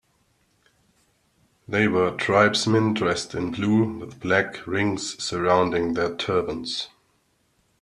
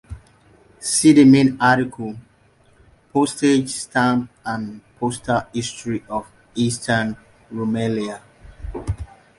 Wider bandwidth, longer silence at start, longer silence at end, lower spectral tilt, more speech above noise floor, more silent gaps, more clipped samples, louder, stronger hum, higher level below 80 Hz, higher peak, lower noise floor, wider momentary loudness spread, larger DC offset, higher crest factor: about the same, 12 kHz vs 11.5 kHz; first, 1.7 s vs 0.1 s; first, 0.95 s vs 0.35 s; about the same, -5 dB/octave vs -5 dB/octave; first, 44 dB vs 37 dB; neither; neither; second, -23 LUFS vs -19 LUFS; neither; second, -58 dBFS vs -44 dBFS; about the same, -4 dBFS vs -2 dBFS; first, -67 dBFS vs -55 dBFS; second, 9 LU vs 19 LU; neither; about the same, 20 dB vs 18 dB